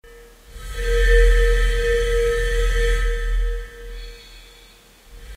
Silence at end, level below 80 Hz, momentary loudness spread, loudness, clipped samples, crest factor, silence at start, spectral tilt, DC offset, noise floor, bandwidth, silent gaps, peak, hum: 0 s; -20 dBFS; 21 LU; -21 LUFS; under 0.1%; 16 dB; 0.15 s; -4 dB/octave; under 0.1%; -48 dBFS; 13.5 kHz; none; -4 dBFS; none